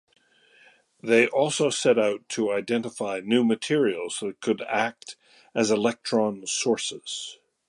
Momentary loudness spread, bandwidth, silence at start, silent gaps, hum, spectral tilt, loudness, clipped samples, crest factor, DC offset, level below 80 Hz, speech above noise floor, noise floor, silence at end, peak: 12 LU; 11.5 kHz; 1.05 s; none; none; -3.5 dB/octave; -25 LUFS; under 0.1%; 20 dB; under 0.1%; -74 dBFS; 34 dB; -59 dBFS; 0.35 s; -6 dBFS